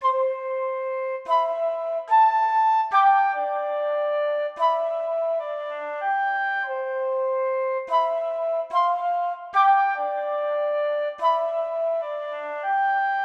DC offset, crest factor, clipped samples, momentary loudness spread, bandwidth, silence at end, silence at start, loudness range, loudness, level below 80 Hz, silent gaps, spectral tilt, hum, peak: under 0.1%; 16 dB; under 0.1%; 9 LU; 7.4 kHz; 0 s; 0 s; 4 LU; -23 LUFS; -76 dBFS; none; -1 dB/octave; none; -8 dBFS